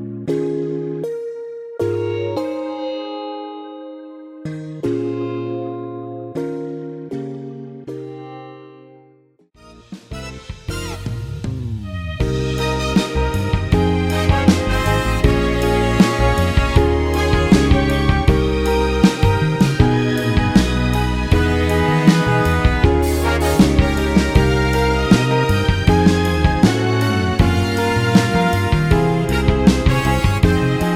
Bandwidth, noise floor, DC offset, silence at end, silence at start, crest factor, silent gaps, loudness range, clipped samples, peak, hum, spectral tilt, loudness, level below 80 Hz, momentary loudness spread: 16.5 kHz; -53 dBFS; under 0.1%; 0 s; 0 s; 16 dB; none; 14 LU; under 0.1%; 0 dBFS; none; -6.5 dB/octave; -17 LUFS; -24 dBFS; 16 LU